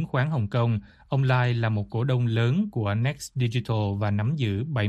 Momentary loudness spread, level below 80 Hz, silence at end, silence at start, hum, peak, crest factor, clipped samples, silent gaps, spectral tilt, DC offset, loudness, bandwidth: 4 LU; -54 dBFS; 0 s; 0 s; none; -10 dBFS; 16 dB; under 0.1%; none; -7 dB/octave; under 0.1%; -26 LUFS; 12 kHz